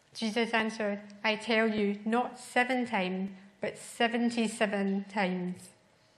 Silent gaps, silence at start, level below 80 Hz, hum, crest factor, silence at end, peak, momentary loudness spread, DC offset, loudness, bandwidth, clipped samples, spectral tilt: none; 0.15 s; -76 dBFS; none; 20 dB; 0.5 s; -12 dBFS; 10 LU; under 0.1%; -31 LUFS; 13 kHz; under 0.1%; -5 dB/octave